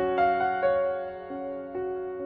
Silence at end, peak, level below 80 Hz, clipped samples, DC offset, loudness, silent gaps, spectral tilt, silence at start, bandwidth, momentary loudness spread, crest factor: 0 s; -14 dBFS; -58 dBFS; under 0.1%; under 0.1%; -28 LUFS; none; -8.5 dB/octave; 0 s; 5.2 kHz; 11 LU; 14 dB